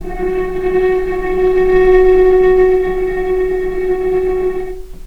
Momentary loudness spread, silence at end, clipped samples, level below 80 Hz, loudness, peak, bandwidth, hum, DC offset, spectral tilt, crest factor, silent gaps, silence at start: 9 LU; 0 s; under 0.1%; -26 dBFS; -13 LUFS; 0 dBFS; 5.2 kHz; none; under 0.1%; -7.5 dB/octave; 12 dB; none; 0 s